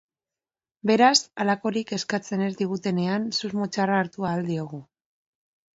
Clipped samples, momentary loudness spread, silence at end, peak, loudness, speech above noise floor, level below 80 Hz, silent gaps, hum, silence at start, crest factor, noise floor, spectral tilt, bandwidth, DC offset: under 0.1%; 11 LU; 0.95 s; -6 dBFS; -24 LUFS; over 66 dB; -68 dBFS; none; none; 0.85 s; 20 dB; under -90 dBFS; -4.5 dB/octave; 8 kHz; under 0.1%